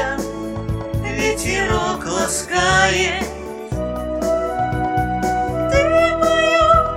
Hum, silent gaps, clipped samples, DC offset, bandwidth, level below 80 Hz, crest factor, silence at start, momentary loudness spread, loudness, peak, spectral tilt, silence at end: none; none; under 0.1%; under 0.1%; 16.5 kHz; -32 dBFS; 16 dB; 0 s; 11 LU; -18 LUFS; -2 dBFS; -4 dB/octave; 0 s